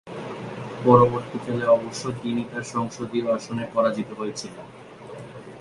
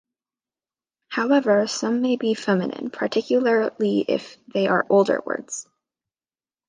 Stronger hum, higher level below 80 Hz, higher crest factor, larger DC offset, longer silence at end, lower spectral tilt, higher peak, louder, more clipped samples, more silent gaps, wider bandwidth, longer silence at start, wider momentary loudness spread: neither; first, -58 dBFS vs -72 dBFS; first, 24 dB vs 18 dB; neither; second, 0 s vs 1.05 s; first, -6.5 dB/octave vs -5 dB/octave; first, 0 dBFS vs -4 dBFS; about the same, -24 LUFS vs -22 LUFS; neither; neither; first, 11.5 kHz vs 10 kHz; second, 0.05 s vs 1.1 s; first, 23 LU vs 11 LU